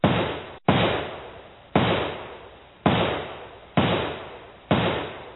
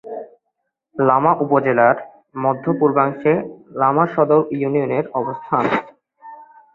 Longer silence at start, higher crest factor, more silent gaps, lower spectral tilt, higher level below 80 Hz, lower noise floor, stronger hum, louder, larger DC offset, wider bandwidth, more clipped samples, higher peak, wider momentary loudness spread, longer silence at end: about the same, 0.05 s vs 0.05 s; first, 24 dB vs 18 dB; neither; second, -4.5 dB/octave vs -9.5 dB/octave; first, -48 dBFS vs -62 dBFS; second, -46 dBFS vs -75 dBFS; neither; second, -25 LUFS vs -18 LUFS; neither; second, 4.2 kHz vs 5.2 kHz; neither; about the same, -2 dBFS vs -2 dBFS; first, 18 LU vs 9 LU; second, 0 s vs 0.3 s